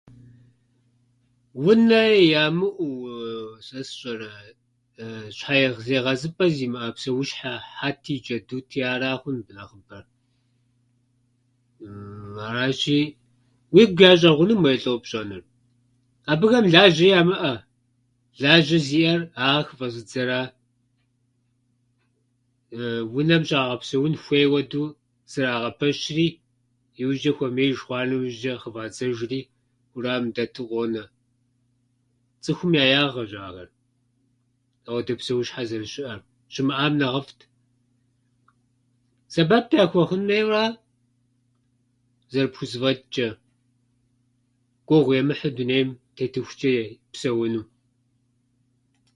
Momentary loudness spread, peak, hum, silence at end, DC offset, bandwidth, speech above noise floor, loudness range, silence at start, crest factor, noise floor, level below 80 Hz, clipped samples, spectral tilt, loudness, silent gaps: 18 LU; 0 dBFS; none; 1.5 s; under 0.1%; 11 kHz; 47 dB; 11 LU; 1.55 s; 24 dB; -69 dBFS; -62 dBFS; under 0.1%; -6 dB/octave; -22 LUFS; none